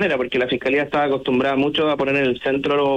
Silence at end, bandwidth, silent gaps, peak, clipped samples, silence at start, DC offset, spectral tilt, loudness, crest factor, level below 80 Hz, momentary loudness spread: 0 s; 8.6 kHz; none; -8 dBFS; under 0.1%; 0 s; under 0.1%; -6.5 dB/octave; -19 LUFS; 10 dB; -54 dBFS; 2 LU